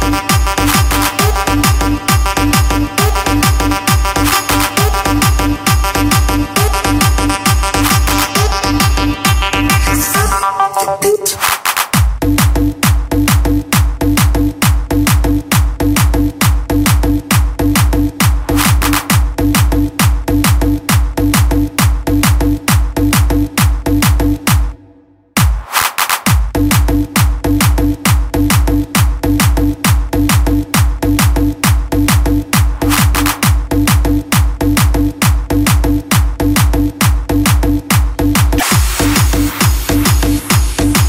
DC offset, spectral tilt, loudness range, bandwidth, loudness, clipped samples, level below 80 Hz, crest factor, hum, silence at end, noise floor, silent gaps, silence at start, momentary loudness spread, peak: under 0.1%; -4.5 dB/octave; 1 LU; 16.5 kHz; -12 LUFS; under 0.1%; -16 dBFS; 10 dB; none; 0 s; -45 dBFS; none; 0 s; 2 LU; 0 dBFS